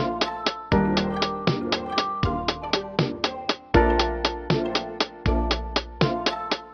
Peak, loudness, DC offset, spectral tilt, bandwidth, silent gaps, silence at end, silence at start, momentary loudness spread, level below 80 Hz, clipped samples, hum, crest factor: -2 dBFS; -25 LUFS; under 0.1%; -5.5 dB/octave; 6.8 kHz; none; 0 s; 0 s; 6 LU; -34 dBFS; under 0.1%; none; 22 dB